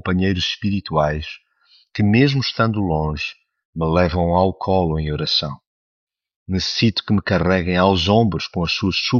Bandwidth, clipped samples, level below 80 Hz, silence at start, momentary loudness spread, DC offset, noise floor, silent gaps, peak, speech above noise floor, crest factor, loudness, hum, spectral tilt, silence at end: 7.2 kHz; under 0.1%; -38 dBFS; 0.05 s; 11 LU; under 0.1%; -56 dBFS; 3.65-3.73 s, 5.67-6.07 s, 6.36-6.46 s; -2 dBFS; 38 dB; 18 dB; -19 LUFS; none; -4.5 dB/octave; 0 s